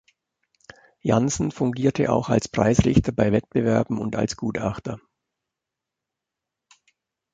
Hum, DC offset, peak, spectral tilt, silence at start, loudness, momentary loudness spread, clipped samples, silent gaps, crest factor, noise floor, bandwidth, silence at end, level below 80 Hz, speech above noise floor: none; under 0.1%; -2 dBFS; -6.5 dB/octave; 1.05 s; -23 LUFS; 9 LU; under 0.1%; none; 22 dB; -86 dBFS; 9.2 kHz; 2.35 s; -44 dBFS; 64 dB